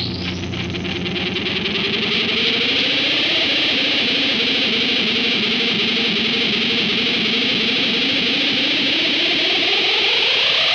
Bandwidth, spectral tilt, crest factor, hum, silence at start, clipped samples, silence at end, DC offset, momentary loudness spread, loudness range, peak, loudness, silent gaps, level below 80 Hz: 11 kHz; -3.5 dB/octave; 14 dB; none; 0 s; under 0.1%; 0 s; under 0.1%; 7 LU; 2 LU; -4 dBFS; -16 LUFS; none; -52 dBFS